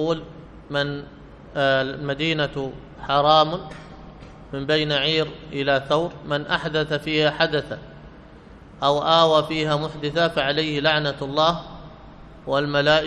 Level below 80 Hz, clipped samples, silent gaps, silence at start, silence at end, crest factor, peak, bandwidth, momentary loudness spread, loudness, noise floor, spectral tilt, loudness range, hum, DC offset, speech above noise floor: -48 dBFS; under 0.1%; none; 0 s; 0 s; 20 dB; -2 dBFS; 11 kHz; 18 LU; -22 LUFS; -44 dBFS; -5.5 dB/octave; 3 LU; none; under 0.1%; 23 dB